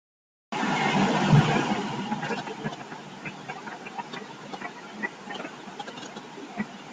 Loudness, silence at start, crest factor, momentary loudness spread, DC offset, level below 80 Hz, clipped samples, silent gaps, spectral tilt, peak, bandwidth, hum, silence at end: -29 LUFS; 0.5 s; 20 dB; 18 LU; under 0.1%; -58 dBFS; under 0.1%; none; -5.5 dB/octave; -8 dBFS; 9.2 kHz; none; 0 s